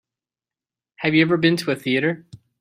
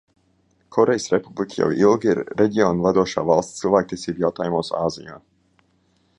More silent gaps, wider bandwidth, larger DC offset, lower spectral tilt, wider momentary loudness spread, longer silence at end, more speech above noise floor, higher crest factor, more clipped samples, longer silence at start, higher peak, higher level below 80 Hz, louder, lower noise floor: neither; first, 15.5 kHz vs 10.5 kHz; neither; about the same, -6 dB/octave vs -6 dB/octave; about the same, 8 LU vs 9 LU; second, 0.25 s vs 1 s; first, over 70 dB vs 43 dB; about the same, 20 dB vs 20 dB; neither; first, 1 s vs 0.7 s; about the same, -2 dBFS vs -2 dBFS; second, -64 dBFS vs -54 dBFS; about the same, -20 LUFS vs -20 LUFS; first, under -90 dBFS vs -63 dBFS